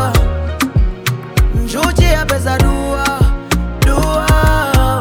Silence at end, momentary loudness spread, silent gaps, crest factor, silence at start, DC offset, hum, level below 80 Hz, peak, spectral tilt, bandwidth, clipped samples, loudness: 0 s; 6 LU; none; 12 dB; 0 s; under 0.1%; none; -16 dBFS; 0 dBFS; -5.5 dB/octave; 17.5 kHz; under 0.1%; -14 LUFS